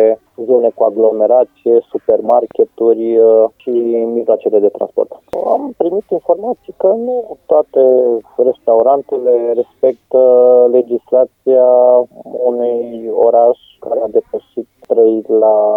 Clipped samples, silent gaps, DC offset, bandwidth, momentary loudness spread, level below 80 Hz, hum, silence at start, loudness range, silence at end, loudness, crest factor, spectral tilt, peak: under 0.1%; none; under 0.1%; 3.6 kHz; 10 LU; -62 dBFS; none; 0 s; 4 LU; 0 s; -12 LUFS; 12 dB; -9.5 dB/octave; 0 dBFS